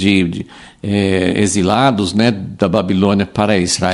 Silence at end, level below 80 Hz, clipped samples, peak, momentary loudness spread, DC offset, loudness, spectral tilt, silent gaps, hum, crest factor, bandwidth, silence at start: 0 s; -44 dBFS; under 0.1%; 0 dBFS; 7 LU; under 0.1%; -15 LUFS; -5 dB/octave; none; none; 14 dB; 11.5 kHz; 0 s